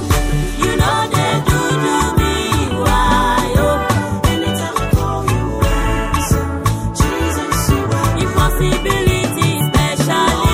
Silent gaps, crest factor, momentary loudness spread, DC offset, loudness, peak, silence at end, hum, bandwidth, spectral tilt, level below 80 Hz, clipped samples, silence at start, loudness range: none; 14 dB; 4 LU; under 0.1%; -16 LUFS; -2 dBFS; 0 s; none; 16.5 kHz; -5 dB/octave; -22 dBFS; under 0.1%; 0 s; 2 LU